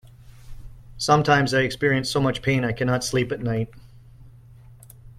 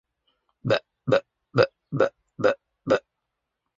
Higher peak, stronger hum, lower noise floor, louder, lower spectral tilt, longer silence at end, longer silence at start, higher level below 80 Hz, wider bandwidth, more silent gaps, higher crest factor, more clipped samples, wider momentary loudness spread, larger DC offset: first, -2 dBFS vs -6 dBFS; neither; second, -47 dBFS vs -82 dBFS; first, -22 LUFS vs -26 LUFS; second, -5 dB/octave vs -6.5 dB/octave; second, 0.1 s vs 0.8 s; second, 0.2 s vs 0.65 s; first, -46 dBFS vs -64 dBFS; first, 15 kHz vs 7.6 kHz; neither; about the same, 22 dB vs 20 dB; neither; first, 9 LU vs 4 LU; neither